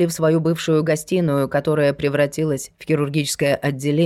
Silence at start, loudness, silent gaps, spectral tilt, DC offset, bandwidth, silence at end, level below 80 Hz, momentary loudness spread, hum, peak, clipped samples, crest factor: 0 s; -20 LUFS; none; -5.5 dB/octave; under 0.1%; 15.5 kHz; 0 s; -54 dBFS; 4 LU; none; -6 dBFS; under 0.1%; 12 dB